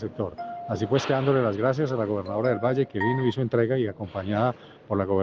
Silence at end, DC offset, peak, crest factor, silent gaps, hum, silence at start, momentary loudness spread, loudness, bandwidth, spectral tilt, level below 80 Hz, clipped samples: 0 s; under 0.1%; -10 dBFS; 16 dB; none; none; 0 s; 9 LU; -26 LUFS; 7.2 kHz; -7.5 dB/octave; -62 dBFS; under 0.1%